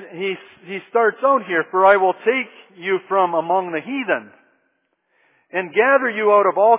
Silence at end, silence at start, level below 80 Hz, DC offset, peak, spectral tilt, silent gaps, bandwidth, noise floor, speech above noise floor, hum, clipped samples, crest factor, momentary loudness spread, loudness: 0 s; 0 s; -76 dBFS; under 0.1%; -2 dBFS; -8 dB/octave; none; 3.9 kHz; -68 dBFS; 51 dB; none; under 0.1%; 18 dB; 13 LU; -18 LUFS